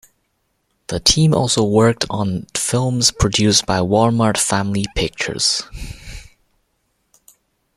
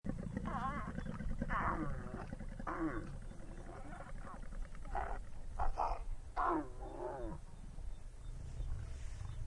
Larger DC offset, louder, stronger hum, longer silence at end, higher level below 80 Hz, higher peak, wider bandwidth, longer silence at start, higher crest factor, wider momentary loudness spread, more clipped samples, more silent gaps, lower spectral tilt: neither; first, -16 LUFS vs -44 LUFS; neither; first, 1.55 s vs 0 s; first, -38 dBFS vs -46 dBFS; first, 0 dBFS vs -22 dBFS; first, 15.5 kHz vs 11 kHz; first, 0.9 s vs 0.05 s; about the same, 18 dB vs 18 dB; about the same, 16 LU vs 14 LU; neither; neither; second, -4 dB/octave vs -7 dB/octave